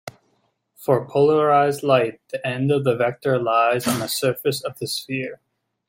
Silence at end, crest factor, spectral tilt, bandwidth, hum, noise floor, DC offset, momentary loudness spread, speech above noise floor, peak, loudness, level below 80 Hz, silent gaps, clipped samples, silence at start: 0.55 s; 18 dB; -5 dB/octave; 16.5 kHz; none; -67 dBFS; under 0.1%; 11 LU; 47 dB; -4 dBFS; -21 LUFS; -64 dBFS; none; under 0.1%; 0.05 s